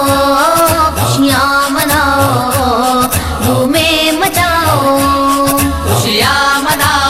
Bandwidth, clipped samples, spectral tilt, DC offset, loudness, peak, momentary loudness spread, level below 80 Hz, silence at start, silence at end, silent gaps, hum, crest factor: 16.5 kHz; under 0.1%; -4 dB/octave; under 0.1%; -10 LUFS; 0 dBFS; 3 LU; -28 dBFS; 0 s; 0 s; none; none; 10 dB